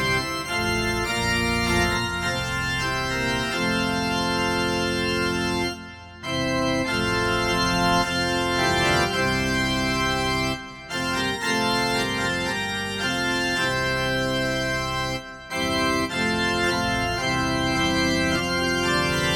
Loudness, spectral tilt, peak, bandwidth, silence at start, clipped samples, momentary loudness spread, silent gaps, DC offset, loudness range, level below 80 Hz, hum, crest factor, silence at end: -23 LUFS; -4 dB/octave; -8 dBFS; 17 kHz; 0 s; under 0.1%; 5 LU; none; under 0.1%; 2 LU; -40 dBFS; none; 16 dB; 0 s